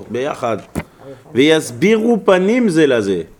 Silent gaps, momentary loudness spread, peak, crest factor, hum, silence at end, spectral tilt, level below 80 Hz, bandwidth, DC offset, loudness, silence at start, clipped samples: none; 10 LU; 0 dBFS; 16 dB; none; 0.15 s; -5.5 dB/octave; -48 dBFS; 19 kHz; under 0.1%; -15 LUFS; 0 s; under 0.1%